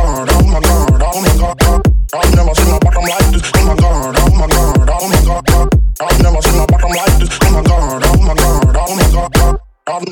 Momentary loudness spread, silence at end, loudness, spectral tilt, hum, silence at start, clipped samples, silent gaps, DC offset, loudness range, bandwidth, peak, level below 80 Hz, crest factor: 2 LU; 0 s; -11 LUFS; -5 dB/octave; none; 0 s; under 0.1%; none; under 0.1%; 0 LU; 17.5 kHz; 0 dBFS; -12 dBFS; 10 dB